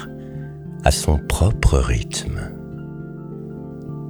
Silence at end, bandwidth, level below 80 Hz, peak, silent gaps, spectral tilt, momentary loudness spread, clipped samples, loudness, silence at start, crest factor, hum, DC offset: 0 s; 20 kHz; -26 dBFS; -2 dBFS; none; -5 dB/octave; 15 LU; under 0.1%; -21 LUFS; 0 s; 20 dB; none; under 0.1%